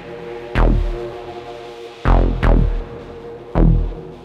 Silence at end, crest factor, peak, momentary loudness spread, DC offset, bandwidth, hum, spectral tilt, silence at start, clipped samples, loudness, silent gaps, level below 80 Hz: 0 s; 18 dB; 0 dBFS; 16 LU; under 0.1%; 5.2 kHz; none; -8.5 dB/octave; 0 s; under 0.1%; -19 LUFS; none; -20 dBFS